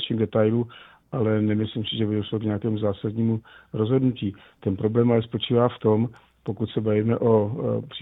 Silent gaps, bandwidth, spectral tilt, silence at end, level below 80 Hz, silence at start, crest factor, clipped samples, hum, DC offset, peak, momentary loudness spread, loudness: none; 4 kHz; -10.5 dB/octave; 0 s; -58 dBFS; 0 s; 18 dB; under 0.1%; none; under 0.1%; -6 dBFS; 10 LU; -24 LUFS